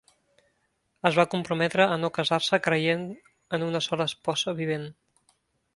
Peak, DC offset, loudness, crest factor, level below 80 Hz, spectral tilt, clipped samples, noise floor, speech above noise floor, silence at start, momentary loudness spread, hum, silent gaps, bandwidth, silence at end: -2 dBFS; under 0.1%; -26 LUFS; 26 dB; -68 dBFS; -4.5 dB/octave; under 0.1%; -74 dBFS; 48 dB; 1.05 s; 10 LU; none; none; 11.5 kHz; 0.85 s